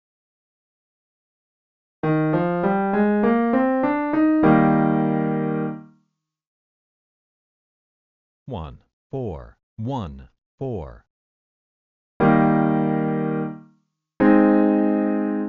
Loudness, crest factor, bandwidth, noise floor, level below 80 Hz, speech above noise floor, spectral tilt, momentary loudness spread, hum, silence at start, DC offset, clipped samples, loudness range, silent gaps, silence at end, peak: -20 LUFS; 18 dB; 4.4 kHz; -71 dBFS; -52 dBFS; 41 dB; -8 dB/octave; 18 LU; none; 2.05 s; under 0.1%; under 0.1%; 18 LU; 6.47-8.46 s, 8.93-9.10 s, 9.63-9.77 s, 10.46-10.58 s, 11.10-12.20 s; 0 s; -4 dBFS